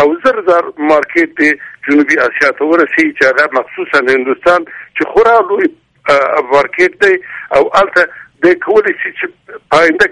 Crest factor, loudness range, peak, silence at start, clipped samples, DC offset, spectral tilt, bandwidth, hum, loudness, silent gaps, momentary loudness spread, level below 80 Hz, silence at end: 10 dB; 1 LU; 0 dBFS; 0 s; under 0.1%; under 0.1%; -4.5 dB/octave; 11 kHz; none; -11 LUFS; none; 7 LU; -48 dBFS; 0 s